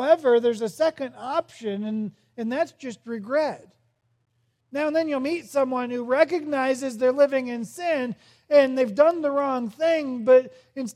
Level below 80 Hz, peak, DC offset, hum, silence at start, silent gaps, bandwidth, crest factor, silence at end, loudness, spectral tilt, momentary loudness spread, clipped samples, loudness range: -78 dBFS; -6 dBFS; under 0.1%; none; 0 s; none; 14 kHz; 18 dB; 0.05 s; -24 LUFS; -5 dB/octave; 15 LU; under 0.1%; 7 LU